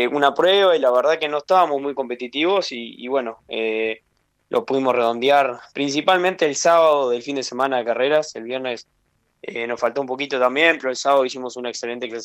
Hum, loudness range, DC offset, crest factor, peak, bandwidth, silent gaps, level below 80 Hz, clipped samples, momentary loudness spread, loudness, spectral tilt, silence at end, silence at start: none; 5 LU; under 0.1%; 20 dB; 0 dBFS; 16 kHz; none; -70 dBFS; under 0.1%; 12 LU; -20 LUFS; -3 dB/octave; 0 s; 0 s